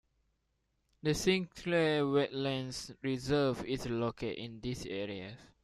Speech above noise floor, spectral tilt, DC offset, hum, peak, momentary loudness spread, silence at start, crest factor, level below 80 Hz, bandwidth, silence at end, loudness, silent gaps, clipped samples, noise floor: 46 dB; -5 dB/octave; under 0.1%; none; -16 dBFS; 11 LU; 1.05 s; 20 dB; -58 dBFS; 14 kHz; 0.2 s; -34 LUFS; none; under 0.1%; -79 dBFS